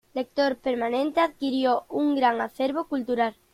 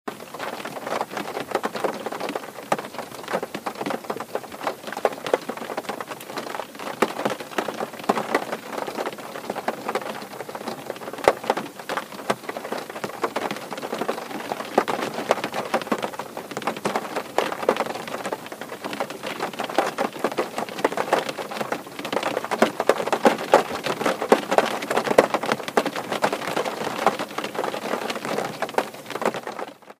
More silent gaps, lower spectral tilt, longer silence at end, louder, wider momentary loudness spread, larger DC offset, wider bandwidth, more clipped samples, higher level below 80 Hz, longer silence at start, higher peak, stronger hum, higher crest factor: neither; first, -5 dB/octave vs -3.5 dB/octave; first, 0.2 s vs 0.05 s; about the same, -25 LUFS vs -26 LUFS; second, 5 LU vs 11 LU; neither; second, 14.5 kHz vs 16 kHz; neither; about the same, -64 dBFS vs -68 dBFS; about the same, 0.15 s vs 0.05 s; second, -8 dBFS vs 0 dBFS; neither; second, 18 dB vs 26 dB